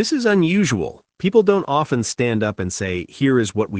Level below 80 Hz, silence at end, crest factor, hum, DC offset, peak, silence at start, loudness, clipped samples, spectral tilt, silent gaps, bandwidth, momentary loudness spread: -54 dBFS; 0 s; 16 dB; none; under 0.1%; -2 dBFS; 0 s; -19 LUFS; under 0.1%; -5.5 dB/octave; none; 10 kHz; 8 LU